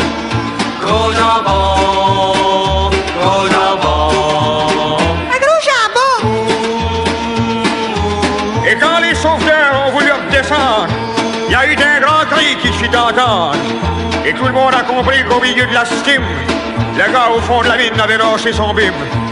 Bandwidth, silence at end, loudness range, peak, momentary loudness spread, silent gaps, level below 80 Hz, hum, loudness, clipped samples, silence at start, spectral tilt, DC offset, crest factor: 11 kHz; 0 s; 2 LU; 0 dBFS; 6 LU; none; -28 dBFS; none; -12 LUFS; under 0.1%; 0 s; -4.5 dB/octave; under 0.1%; 12 dB